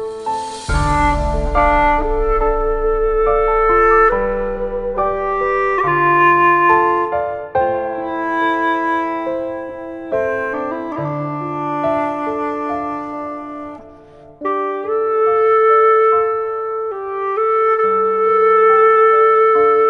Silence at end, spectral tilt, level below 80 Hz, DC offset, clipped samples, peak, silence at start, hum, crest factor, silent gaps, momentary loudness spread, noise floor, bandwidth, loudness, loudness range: 0 s; -6.5 dB/octave; -30 dBFS; under 0.1%; under 0.1%; 0 dBFS; 0 s; none; 14 dB; none; 12 LU; -41 dBFS; 11 kHz; -16 LUFS; 7 LU